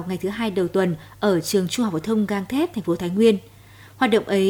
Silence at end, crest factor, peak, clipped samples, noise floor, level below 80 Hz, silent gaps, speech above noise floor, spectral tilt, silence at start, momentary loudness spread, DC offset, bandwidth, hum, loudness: 0 s; 16 dB; -6 dBFS; under 0.1%; -46 dBFS; -56 dBFS; none; 25 dB; -5.5 dB/octave; 0 s; 7 LU; under 0.1%; 19.5 kHz; none; -22 LUFS